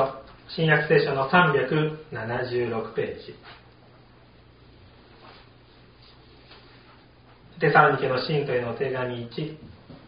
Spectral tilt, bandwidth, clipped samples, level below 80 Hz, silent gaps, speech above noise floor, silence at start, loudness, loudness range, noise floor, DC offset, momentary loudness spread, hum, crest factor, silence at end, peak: -4 dB/octave; 5.2 kHz; under 0.1%; -58 dBFS; none; 29 dB; 0 s; -24 LUFS; 12 LU; -53 dBFS; under 0.1%; 17 LU; none; 24 dB; 0.1 s; -2 dBFS